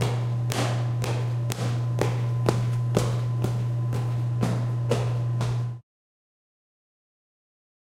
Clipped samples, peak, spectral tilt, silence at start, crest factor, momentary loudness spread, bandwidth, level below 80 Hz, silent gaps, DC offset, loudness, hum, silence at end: under 0.1%; -6 dBFS; -6.5 dB/octave; 0 s; 22 dB; 3 LU; 13.5 kHz; -50 dBFS; none; under 0.1%; -26 LUFS; none; 2 s